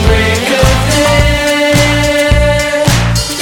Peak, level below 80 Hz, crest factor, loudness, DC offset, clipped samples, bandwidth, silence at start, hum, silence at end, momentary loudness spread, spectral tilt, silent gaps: 0 dBFS; -16 dBFS; 10 dB; -9 LUFS; under 0.1%; 0.3%; 18.5 kHz; 0 s; none; 0 s; 2 LU; -4.5 dB/octave; none